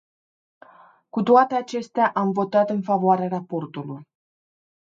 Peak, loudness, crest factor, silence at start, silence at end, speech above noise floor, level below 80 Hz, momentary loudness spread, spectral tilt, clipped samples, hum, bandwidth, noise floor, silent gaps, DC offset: -4 dBFS; -21 LUFS; 20 dB; 1.15 s; 0.85 s; 31 dB; -74 dBFS; 16 LU; -7.5 dB/octave; under 0.1%; none; 7.6 kHz; -52 dBFS; none; under 0.1%